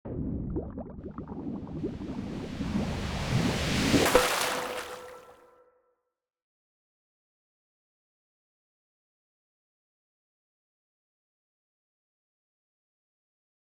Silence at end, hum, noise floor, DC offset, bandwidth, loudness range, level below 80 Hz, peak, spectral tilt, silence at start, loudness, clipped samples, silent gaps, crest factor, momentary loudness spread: 8.45 s; none; -76 dBFS; under 0.1%; over 20 kHz; 9 LU; -48 dBFS; -6 dBFS; -4.5 dB/octave; 0.05 s; -30 LUFS; under 0.1%; none; 30 dB; 18 LU